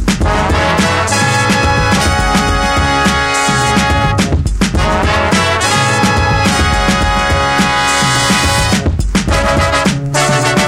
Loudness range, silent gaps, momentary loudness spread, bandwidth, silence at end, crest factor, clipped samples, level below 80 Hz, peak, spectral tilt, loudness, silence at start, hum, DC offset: 1 LU; none; 3 LU; 16.5 kHz; 0 s; 12 dB; under 0.1%; -20 dBFS; 0 dBFS; -4 dB/octave; -11 LUFS; 0 s; none; under 0.1%